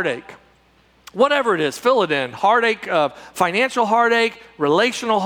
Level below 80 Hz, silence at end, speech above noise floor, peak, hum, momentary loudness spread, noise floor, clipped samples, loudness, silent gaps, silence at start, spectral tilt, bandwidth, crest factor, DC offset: -64 dBFS; 0 s; 37 dB; -2 dBFS; none; 8 LU; -56 dBFS; under 0.1%; -18 LUFS; none; 0 s; -4 dB/octave; 20 kHz; 16 dB; under 0.1%